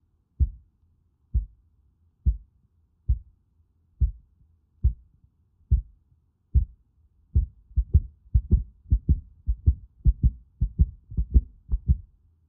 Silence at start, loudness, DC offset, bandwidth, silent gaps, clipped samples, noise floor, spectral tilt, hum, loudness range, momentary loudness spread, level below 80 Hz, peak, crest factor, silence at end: 0.4 s; -29 LUFS; under 0.1%; 0.5 kHz; none; under 0.1%; -66 dBFS; -20 dB/octave; none; 7 LU; 8 LU; -28 dBFS; -6 dBFS; 22 dB; 0.45 s